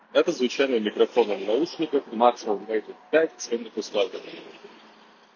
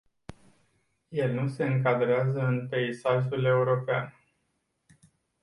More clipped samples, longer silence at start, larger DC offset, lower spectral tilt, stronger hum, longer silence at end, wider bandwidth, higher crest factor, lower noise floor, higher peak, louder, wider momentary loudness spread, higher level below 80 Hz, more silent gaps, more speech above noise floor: neither; second, 0.15 s vs 0.3 s; neither; second, -4 dB/octave vs -8 dB/octave; neither; second, 0.7 s vs 1.3 s; second, 7.2 kHz vs 11 kHz; about the same, 20 dB vs 16 dB; second, -53 dBFS vs -77 dBFS; first, -4 dBFS vs -12 dBFS; about the same, -25 LUFS vs -27 LUFS; first, 9 LU vs 6 LU; second, -76 dBFS vs -64 dBFS; neither; second, 28 dB vs 50 dB